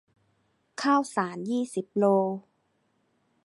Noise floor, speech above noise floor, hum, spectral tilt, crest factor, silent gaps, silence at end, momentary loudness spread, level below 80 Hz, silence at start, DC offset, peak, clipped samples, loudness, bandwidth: -72 dBFS; 46 dB; none; -5.5 dB/octave; 18 dB; none; 1.05 s; 9 LU; -80 dBFS; 0.8 s; under 0.1%; -10 dBFS; under 0.1%; -27 LUFS; 11.5 kHz